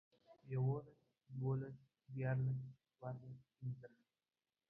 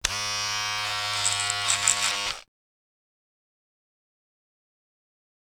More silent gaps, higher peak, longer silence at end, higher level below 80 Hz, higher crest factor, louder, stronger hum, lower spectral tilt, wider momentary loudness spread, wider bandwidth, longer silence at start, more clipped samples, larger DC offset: neither; second, -30 dBFS vs 0 dBFS; second, 0.8 s vs 3.05 s; second, -78 dBFS vs -54 dBFS; second, 16 dB vs 30 dB; second, -45 LUFS vs -24 LUFS; neither; first, -10.5 dB/octave vs 1 dB/octave; first, 17 LU vs 7 LU; second, 2.8 kHz vs over 20 kHz; first, 0.3 s vs 0.05 s; neither; neither